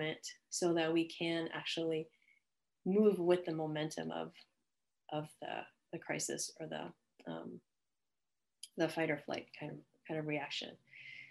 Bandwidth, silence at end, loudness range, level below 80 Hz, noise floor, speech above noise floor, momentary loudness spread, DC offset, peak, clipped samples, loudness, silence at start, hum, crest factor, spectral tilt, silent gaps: 12.5 kHz; 0 s; 8 LU; -86 dBFS; under -90 dBFS; over 52 dB; 18 LU; under 0.1%; -18 dBFS; under 0.1%; -38 LUFS; 0 s; none; 20 dB; -4.5 dB/octave; none